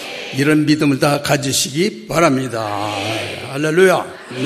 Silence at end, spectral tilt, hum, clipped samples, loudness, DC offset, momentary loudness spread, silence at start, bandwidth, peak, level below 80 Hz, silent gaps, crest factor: 0 s; -4.5 dB/octave; none; under 0.1%; -16 LUFS; under 0.1%; 8 LU; 0 s; 14 kHz; 0 dBFS; -52 dBFS; none; 16 dB